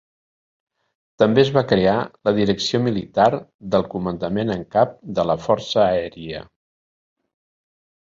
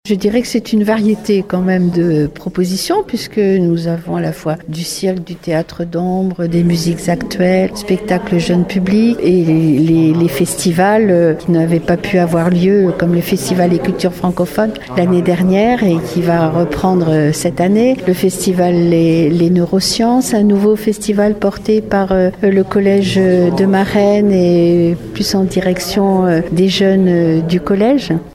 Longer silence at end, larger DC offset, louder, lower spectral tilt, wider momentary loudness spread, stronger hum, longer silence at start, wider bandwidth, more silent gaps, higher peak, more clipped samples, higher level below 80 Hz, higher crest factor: first, 1.7 s vs 0 s; neither; second, -20 LUFS vs -13 LUFS; about the same, -6 dB/octave vs -6.5 dB/octave; first, 9 LU vs 6 LU; neither; first, 1.2 s vs 0.05 s; second, 7.8 kHz vs 16 kHz; first, 3.54-3.59 s vs none; about the same, -2 dBFS vs 0 dBFS; neither; second, -50 dBFS vs -40 dBFS; first, 20 dB vs 12 dB